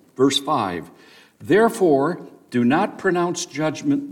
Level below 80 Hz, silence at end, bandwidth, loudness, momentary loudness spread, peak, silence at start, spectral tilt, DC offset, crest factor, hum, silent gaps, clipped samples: -64 dBFS; 0 s; 17 kHz; -20 LUFS; 10 LU; -6 dBFS; 0.2 s; -5 dB/octave; under 0.1%; 16 dB; none; none; under 0.1%